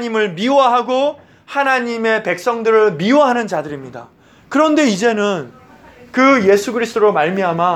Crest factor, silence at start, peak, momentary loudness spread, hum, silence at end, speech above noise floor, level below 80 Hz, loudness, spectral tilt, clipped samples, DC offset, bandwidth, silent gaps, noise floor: 14 dB; 0 s; 0 dBFS; 11 LU; none; 0 s; 27 dB; -60 dBFS; -15 LUFS; -5 dB/octave; under 0.1%; under 0.1%; 14 kHz; none; -42 dBFS